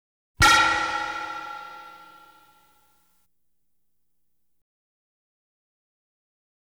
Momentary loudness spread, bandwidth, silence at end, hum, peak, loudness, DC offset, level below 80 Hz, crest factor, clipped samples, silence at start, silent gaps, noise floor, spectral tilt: 24 LU; over 20 kHz; 4.65 s; 60 Hz at -80 dBFS; -6 dBFS; -20 LUFS; under 0.1%; -46 dBFS; 22 dB; under 0.1%; 0.4 s; none; -79 dBFS; -1.5 dB/octave